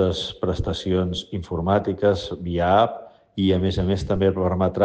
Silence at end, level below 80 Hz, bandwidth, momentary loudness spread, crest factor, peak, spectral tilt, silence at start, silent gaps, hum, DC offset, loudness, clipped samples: 0 s; -40 dBFS; 8.8 kHz; 8 LU; 16 dB; -6 dBFS; -7 dB/octave; 0 s; none; none; under 0.1%; -22 LUFS; under 0.1%